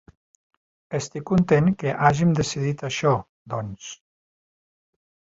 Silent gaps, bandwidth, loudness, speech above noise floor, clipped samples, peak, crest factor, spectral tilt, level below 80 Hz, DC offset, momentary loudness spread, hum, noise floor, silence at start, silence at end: 3.29-3.45 s; 8 kHz; -23 LUFS; over 68 dB; under 0.1%; -2 dBFS; 22 dB; -6 dB/octave; -52 dBFS; under 0.1%; 14 LU; none; under -90 dBFS; 0.9 s; 1.35 s